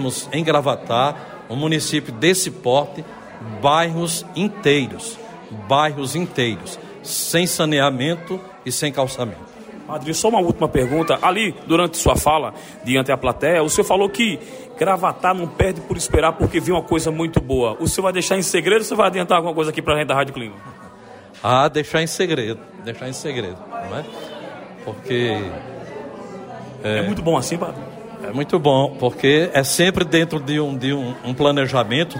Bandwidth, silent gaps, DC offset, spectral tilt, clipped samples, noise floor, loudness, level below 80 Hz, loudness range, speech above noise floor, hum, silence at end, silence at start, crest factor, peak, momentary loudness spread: 16.5 kHz; none; under 0.1%; -4.5 dB/octave; under 0.1%; -41 dBFS; -19 LUFS; -40 dBFS; 7 LU; 22 dB; none; 0 s; 0 s; 16 dB; -4 dBFS; 17 LU